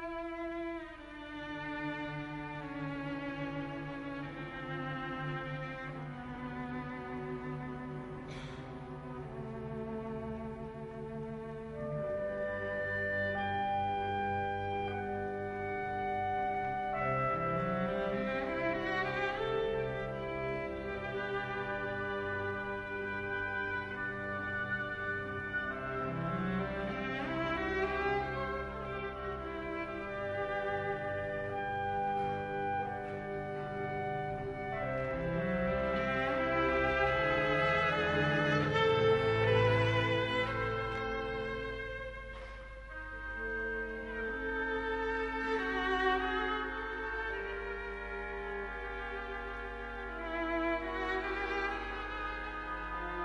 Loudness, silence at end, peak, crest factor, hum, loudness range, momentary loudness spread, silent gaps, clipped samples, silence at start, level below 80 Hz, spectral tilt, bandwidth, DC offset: -36 LUFS; 0 s; -18 dBFS; 18 dB; none; 10 LU; 12 LU; none; under 0.1%; 0 s; -52 dBFS; -7 dB/octave; 10.5 kHz; under 0.1%